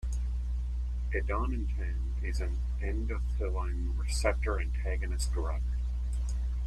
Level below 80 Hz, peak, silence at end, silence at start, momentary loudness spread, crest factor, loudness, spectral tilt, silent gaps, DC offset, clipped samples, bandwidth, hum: -32 dBFS; -14 dBFS; 0 s; 0 s; 4 LU; 18 dB; -34 LUFS; -5.5 dB/octave; none; under 0.1%; under 0.1%; 11.5 kHz; 60 Hz at -30 dBFS